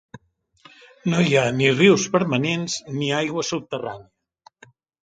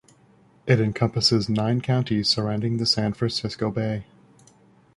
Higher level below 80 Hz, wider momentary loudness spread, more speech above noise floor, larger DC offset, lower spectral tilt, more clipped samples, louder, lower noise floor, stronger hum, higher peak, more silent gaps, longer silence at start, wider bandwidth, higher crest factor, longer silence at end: second, -60 dBFS vs -52 dBFS; first, 14 LU vs 7 LU; about the same, 35 dB vs 34 dB; neither; about the same, -5 dB/octave vs -5.5 dB/octave; neither; first, -20 LUFS vs -23 LUFS; about the same, -55 dBFS vs -57 dBFS; neither; about the same, -2 dBFS vs -4 dBFS; neither; second, 0.15 s vs 0.65 s; second, 9.4 kHz vs 11.5 kHz; about the same, 20 dB vs 22 dB; about the same, 1 s vs 0.95 s